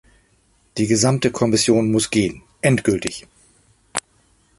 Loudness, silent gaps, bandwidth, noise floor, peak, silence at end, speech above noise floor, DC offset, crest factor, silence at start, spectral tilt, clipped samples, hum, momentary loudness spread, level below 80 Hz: -19 LUFS; none; 12 kHz; -60 dBFS; -2 dBFS; 0.6 s; 42 dB; under 0.1%; 20 dB; 0.75 s; -4.5 dB/octave; under 0.1%; none; 12 LU; -50 dBFS